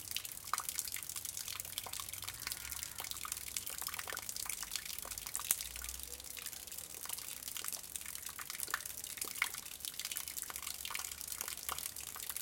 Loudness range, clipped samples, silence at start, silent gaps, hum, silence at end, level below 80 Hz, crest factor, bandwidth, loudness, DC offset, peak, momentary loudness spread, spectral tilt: 1 LU; under 0.1%; 0 s; none; none; 0 s; -64 dBFS; 38 dB; 17 kHz; -41 LUFS; under 0.1%; -6 dBFS; 6 LU; 0.5 dB/octave